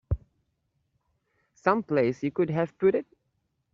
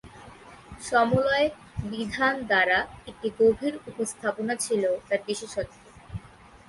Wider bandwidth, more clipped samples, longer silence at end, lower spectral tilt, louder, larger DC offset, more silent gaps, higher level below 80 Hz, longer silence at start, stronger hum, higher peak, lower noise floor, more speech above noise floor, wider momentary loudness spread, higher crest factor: second, 7.2 kHz vs 12 kHz; neither; first, 0.7 s vs 0.4 s; first, -7 dB/octave vs -4 dB/octave; about the same, -27 LUFS vs -26 LUFS; neither; neither; first, -46 dBFS vs -52 dBFS; about the same, 0.1 s vs 0.05 s; neither; first, -6 dBFS vs -10 dBFS; first, -76 dBFS vs -51 dBFS; first, 51 dB vs 25 dB; second, 8 LU vs 17 LU; first, 24 dB vs 18 dB